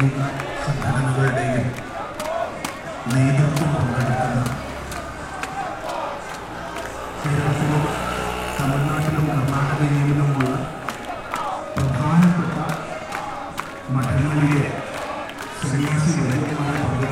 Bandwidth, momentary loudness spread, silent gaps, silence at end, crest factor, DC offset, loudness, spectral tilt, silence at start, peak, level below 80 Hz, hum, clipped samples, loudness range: 15.5 kHz; 11 LU; none; 0 s; 18 dB; under 0.1%; -22 LUFS; -6.5 dB/octave; 0 s; -4 dBFS; -42 dBFS; none; under 0.1%; 4 LU